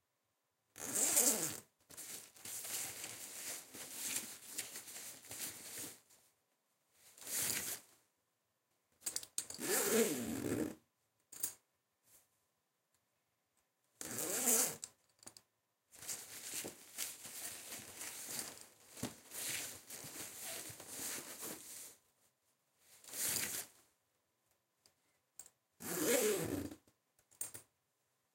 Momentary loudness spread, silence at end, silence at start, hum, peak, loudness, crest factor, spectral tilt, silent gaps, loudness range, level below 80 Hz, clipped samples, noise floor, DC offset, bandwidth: 19 LU; 0.7 s; 0.75 s; none; -12 dBFS; -40 LUFS; 32 dB; -1.5 dB/octave; none; 8 LU; -78 dBFS; under 0.1%; -85 dBFS; under 0.1%; 17 kHz